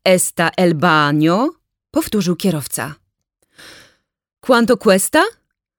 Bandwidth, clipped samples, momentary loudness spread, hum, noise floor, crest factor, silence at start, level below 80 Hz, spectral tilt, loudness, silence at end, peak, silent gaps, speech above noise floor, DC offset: over 20 kHz; under 0.1%; 10 LU; none; -67 dBFS; 16 dB; 0.05 s; -52 dBFS; -4.5 dB/octave; -15 LUFS; 0.5 s; -2 dBFS; none; 52 dB; under 0.1%